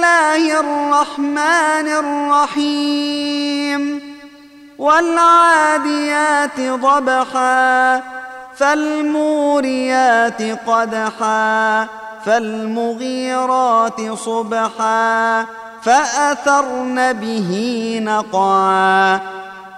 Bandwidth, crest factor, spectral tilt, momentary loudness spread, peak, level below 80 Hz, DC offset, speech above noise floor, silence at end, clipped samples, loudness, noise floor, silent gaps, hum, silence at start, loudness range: 12 kHz; 14 dB; -3.5 dB/octave; 8 LU; -2 dBFS; -62 dBFS; under 0.1%; 26 dB; 0 s; under 0.1%; -15 LUFS; -41 dBFS; none; none; 0 s; 4 LU